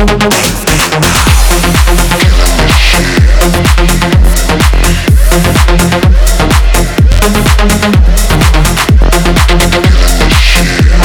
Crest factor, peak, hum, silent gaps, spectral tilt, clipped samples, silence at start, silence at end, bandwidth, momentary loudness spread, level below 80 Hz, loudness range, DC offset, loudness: 6 dB; 0 dBFS; none; none; -4.5 dB/octave; 6%; 0 s; 0 s; 19 kHz; 2 LU; -8 dBFS; 1 LU; under 0.1%; -7 LUFS